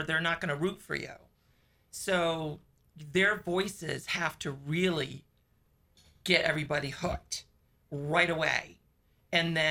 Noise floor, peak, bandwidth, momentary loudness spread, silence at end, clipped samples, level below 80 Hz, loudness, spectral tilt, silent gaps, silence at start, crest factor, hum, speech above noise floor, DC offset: -69 dBFS; -10 dBFS; 17 kHz; 14 LU; 0 s; under 0.1%; -58 dBFS; -31 LUFS; -4 dB/octave; none; 0 s; 22 dB; none; 38 dB; under 0.1%